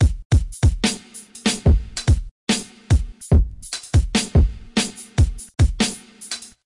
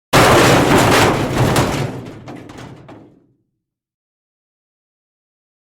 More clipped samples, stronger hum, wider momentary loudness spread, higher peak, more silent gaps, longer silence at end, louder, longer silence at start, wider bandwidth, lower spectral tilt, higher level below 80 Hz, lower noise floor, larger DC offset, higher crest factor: neither; neither; second, 12 LU vs 24 LU; second, -6 dBFS vs 0 dBFS; first, 0.25-0.30 s, 2.31-2.47 s vs none; second, 0.2 s vs 2.75 s; second, -21 LUFS vs -12 LUFS; second, 0 s vs 0.15 s; second, 11.5 kHz vs over 20 kHz; about the same, -5 dB/octave vs -4.5 dB/octave; first, -24 dBFS vs -36 dBFS; second, -40 dBFS vs -75 dBFS; neither; about the same, 12 dB vs 16 dB